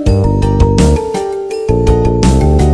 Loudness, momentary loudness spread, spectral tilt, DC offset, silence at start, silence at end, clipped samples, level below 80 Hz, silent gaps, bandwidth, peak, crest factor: -12 LUFS; 8 LU; -7 dB/octave; under 0.1%; 0 s; 0 s; under 0.1%; -16 dBFS; none; 11 kHz; 0 dBFS; 10 dB